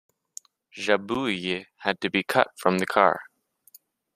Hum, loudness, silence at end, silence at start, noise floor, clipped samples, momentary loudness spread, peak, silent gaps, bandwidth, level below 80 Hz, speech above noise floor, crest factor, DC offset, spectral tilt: none; -25 LUFS; 0.9 s; 0.75 s; -57 dBFS; under 0.1%; 23 LU; -2 dBFS; none; 15.5 kHz; -66 dBFS; 32 dB; 24 dB; under 0.1%; -4.5 dB/octave